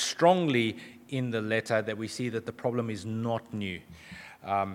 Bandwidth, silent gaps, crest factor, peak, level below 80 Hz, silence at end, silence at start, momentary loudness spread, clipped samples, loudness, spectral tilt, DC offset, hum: 16.5 kHz; none; 22 dB; -8 dBFS; -68 dBFS; 0 s; 0 s; 19 LU; under 0.1%; -30 LUFS; -5 dB/octave; under 0.1%; none